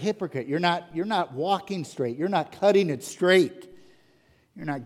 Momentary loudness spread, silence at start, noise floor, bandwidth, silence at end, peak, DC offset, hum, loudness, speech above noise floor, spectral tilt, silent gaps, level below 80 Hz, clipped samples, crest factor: 10 LU; 0 s; -62 dBFS; 14.5 kHz; 0 s; -6 dBFS; under 0.1%; none; -25 LUFS; 37 dB; -5.5 dB/octave; none; -70 dBFS; under 0.1%; 20 dB